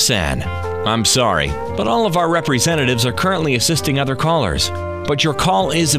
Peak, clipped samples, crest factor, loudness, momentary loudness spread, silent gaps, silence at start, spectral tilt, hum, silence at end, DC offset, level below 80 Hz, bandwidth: -2 dBFS; under 0.1%; 14 dB; -17 LUFS; 7 LU; none; 0 s; -4 dB/octave; none; 0 s; 1%; -34 dBFS; 16 kHz